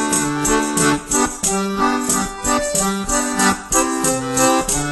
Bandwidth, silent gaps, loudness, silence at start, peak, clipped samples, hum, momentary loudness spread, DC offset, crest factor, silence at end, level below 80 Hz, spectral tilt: 12.5 kHz; none; -17 LUFS; 0 s; -2 dBFS; under 0.1%; none; 3 LU; under 0.1%; 16 dB; 0 s; -36 dBFS; -3 dB/octave